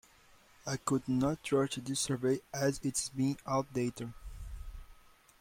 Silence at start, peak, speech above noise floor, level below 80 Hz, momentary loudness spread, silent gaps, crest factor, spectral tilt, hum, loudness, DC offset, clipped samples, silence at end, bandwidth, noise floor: 0.65 s; -18 dBFS; 29 dB; -54 dBFS; 17 LU; none; 18 dB; -5 dB/octave; none; -34 LUFS; under 0.1%; under 0.1%; 0.45 s; 16.5 kHz; -62 dBFS